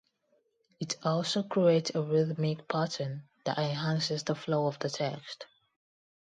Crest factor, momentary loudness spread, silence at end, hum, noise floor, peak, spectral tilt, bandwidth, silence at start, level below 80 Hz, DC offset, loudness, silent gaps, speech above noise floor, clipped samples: 20 dB; 12 LU; 0.9 s; none; -74 dBFS; -12 dBFS; -5.5 dB/octave; 9.6 kHz; 0.8 s; -74 dBFS; under 0.1%; -31 LUFS; none; 43 dB; under 0.1%